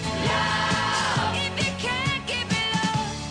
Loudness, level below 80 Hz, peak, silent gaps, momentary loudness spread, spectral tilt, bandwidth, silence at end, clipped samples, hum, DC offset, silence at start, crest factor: -24 LUFS; -46 dBFS; -12 dBFS; none; 3 LU; -3.5 dB/octave; 10.5 kHz; 0 s; under 0.1%; none; under 0.1%; 0 s; 14 dB